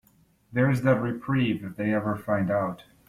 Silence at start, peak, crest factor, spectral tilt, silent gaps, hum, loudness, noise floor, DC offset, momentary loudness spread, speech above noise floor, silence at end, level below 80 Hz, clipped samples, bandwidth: 0.5 s; -8 dBFS; 18 dB; -8 dB/octave; none; none; -26 LUFS; -62 dBFS; under 0.1%; 6 LU; 37 dB; 0.25 s; -56 dBFS; under 0.1%; 14 kHz